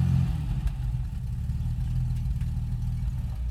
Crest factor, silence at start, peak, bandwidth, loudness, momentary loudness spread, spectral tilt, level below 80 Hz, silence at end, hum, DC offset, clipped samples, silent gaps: 14 dB; 0 s; -14 dBFS; 13 kHz; -30 LUFS; 5 LU; -8 dB/octave; -32 dBFS; 0 s; none; under 0.1%; under 0.1%; none